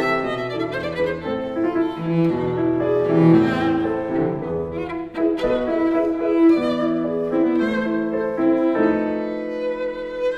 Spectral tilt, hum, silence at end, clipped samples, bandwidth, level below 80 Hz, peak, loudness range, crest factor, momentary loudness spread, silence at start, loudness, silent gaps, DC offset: -8.5 dB/octave; none; 0 s; under 0.1%; 5.8 kHz; -48 dBFS; -4 dBFS; 2 LU; 16 dB; 9 LU; 0 s; -21 LUFS; none; under 0.1%